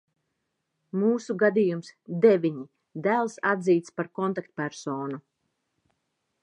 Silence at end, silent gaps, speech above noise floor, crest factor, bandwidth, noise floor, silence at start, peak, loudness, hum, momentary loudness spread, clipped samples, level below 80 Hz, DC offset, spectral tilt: 1.25 s; none; 54 dB; 20 dB; 9.8 kHz; -79 dBFS; 0.95 s; -6 dBFS; -26 LUFS; none; 14 LU; under 0.1%; -80 dBFS; under 0.1%; -7 dB/octave